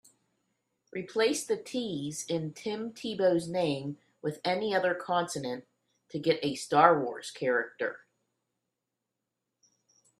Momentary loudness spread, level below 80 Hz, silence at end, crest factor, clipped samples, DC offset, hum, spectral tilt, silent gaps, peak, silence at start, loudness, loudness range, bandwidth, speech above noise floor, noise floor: 12 LU; -76 dBFS; 2.25 s; 26 dB; under 0.1%; under 0.1%; none; -4.5 dB/octave; none; -4 dBFS; 0.95 s; -30 LUFS; 4 LU; 13.5 kHz; 56 dB; -86 dBFS